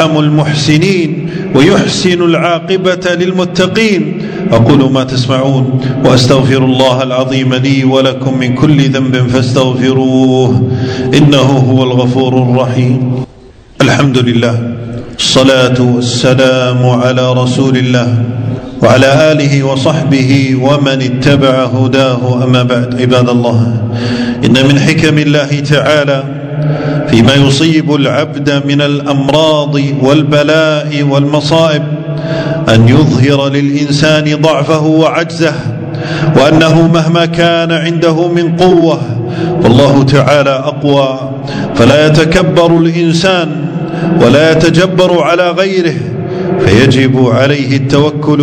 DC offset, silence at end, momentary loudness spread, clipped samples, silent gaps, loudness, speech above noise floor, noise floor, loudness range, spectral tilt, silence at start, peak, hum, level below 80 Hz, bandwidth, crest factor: under 0.1%; 0 s; 7 LU; 3%; none; -9 LUFS; 27 dB; -35 dBFS; 2 LU; -6 dB/octave; 0 s; 0 dBFS; none; -36 dBFS; 10.5 kHz; 8 dB